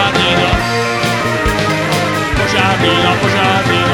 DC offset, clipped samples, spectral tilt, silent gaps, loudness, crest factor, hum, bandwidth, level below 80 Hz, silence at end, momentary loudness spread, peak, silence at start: under 0.1%; under 0.1%; -4.5 dB/octave; none; -12 LUFS; 12 dB; none; 19 kHz; -30 dBFS; 0 s; 3 LU; 0 dBFS; 0 s